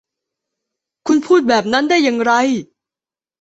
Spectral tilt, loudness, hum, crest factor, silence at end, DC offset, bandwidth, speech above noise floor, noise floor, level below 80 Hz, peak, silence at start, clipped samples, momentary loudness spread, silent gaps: -4 dB/octave; -15 LUFS; none; 16 dB; 0.8 s; under 0.1%; 8.2 kHz; over 76 dB; under -90 dBFS; -60 dBFS; -2 dBFS; 1.05 s; under 0.1%; 7 LU; none